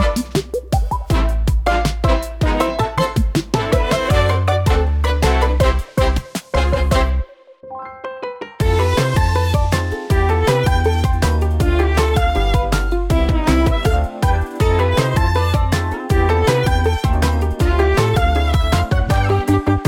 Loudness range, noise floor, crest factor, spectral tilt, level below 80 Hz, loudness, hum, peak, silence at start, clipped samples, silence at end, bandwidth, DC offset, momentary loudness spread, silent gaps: 3 LU; -38 dBFS; 14 dB; -6 dB/octave; -20 dBFS; -17 LUFS; none; -2 dBFS; 0 s; under 0.1%; 0 s; 17 kHz; under 0.1%; 5 LU; none